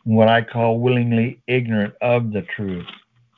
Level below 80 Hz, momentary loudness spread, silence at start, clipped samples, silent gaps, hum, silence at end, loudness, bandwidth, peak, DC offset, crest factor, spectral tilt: -54 dBFS; 12 LU; 0.05 s; under 0.1%; none; none; 0.45 s; -19 LUFS; 4.4 kHz; -2 dBFS; under 0.1%; 16 dB; -10 dB/octave